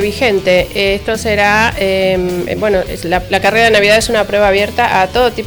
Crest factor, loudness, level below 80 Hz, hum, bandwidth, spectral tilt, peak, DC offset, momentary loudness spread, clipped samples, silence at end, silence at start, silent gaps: 10 dB; -12 LUFS; -32 dBFS; none; over 20 kHz; -4 dB/octave; -2 dBFS; under 0.1%; 7 LU; under 0.1%; 0 s; 0 s; none